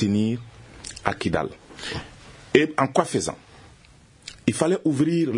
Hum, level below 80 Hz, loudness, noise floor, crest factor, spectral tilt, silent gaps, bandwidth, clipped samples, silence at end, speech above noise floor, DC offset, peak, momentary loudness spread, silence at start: none; -52 dBFS; -24 LUFS; -52 dBFS; 24 dB; -5.5 dB/octave; none; 11 kHz; under 0.1%; 0 s; 29 dB; under 0.1%; 0 dBFS; 20 LU; 0 s